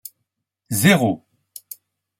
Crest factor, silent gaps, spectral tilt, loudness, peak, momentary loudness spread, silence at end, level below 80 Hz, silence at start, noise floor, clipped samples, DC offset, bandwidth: 22 dB; none; -4.5 dB/octave; -18 LUFS; -2 dBFS; 24 LU; 1.05 s; -60 dBFS; 0.7 s; -77 dBFS; under 0.1%; under 0.1%; 16.5 kHz